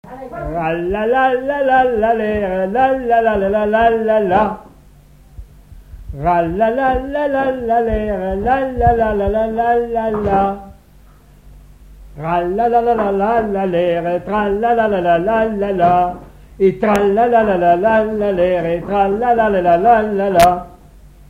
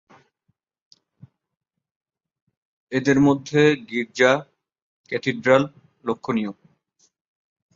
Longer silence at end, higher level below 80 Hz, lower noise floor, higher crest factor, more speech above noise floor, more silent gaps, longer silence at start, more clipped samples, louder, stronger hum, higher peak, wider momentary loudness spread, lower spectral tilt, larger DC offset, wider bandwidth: second, 0.25 s vs 1.25 s; first, -34 dBFS vs -62 dBFS; second, -45 dBFS vs -73 dBFS; second, 16 dB vs 22 dB; second, 30 dB vs 53 dB; second, none vs 4.82-5.04 s; second, 0.05 s vs 2.9 s; neither; first, -15 LUFS vs -21 LUFS; neither; about the same, 0 dBFS vs -2 dBFS; second, 6 LU vs 12 LU; about the same, -7 dB/octave vs -6 dB/octave; first, 0.1% vs under 0.1%; first, 16 kHz vs 7.6 kHz